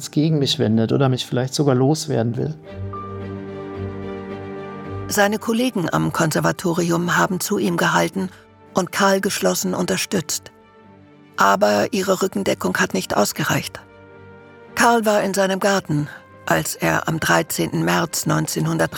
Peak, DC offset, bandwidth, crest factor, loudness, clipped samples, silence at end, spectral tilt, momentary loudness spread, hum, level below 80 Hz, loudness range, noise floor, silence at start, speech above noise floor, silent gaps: -2 dBFS; under 0.1%; 18 kHz; 18 dB; -19 LUFS; under 0.1%; 0 s; -4.5 dB/octave; 14 LU; none; -56 dBFS; 4 LU; -47 dBFS; 0 s; 28 dB; none